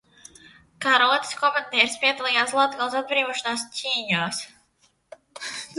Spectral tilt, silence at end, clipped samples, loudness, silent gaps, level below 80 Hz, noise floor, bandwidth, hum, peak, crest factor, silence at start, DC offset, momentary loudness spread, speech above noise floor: -2 dB/octave; 0 s; under 0.1%; -22 LUFS; none; -70 dBFS; -65 dBFS; 12 kHz; none; -2 dBFS; 24 dB; 0.8 s; under 0.1%; 13 LU; 42 dB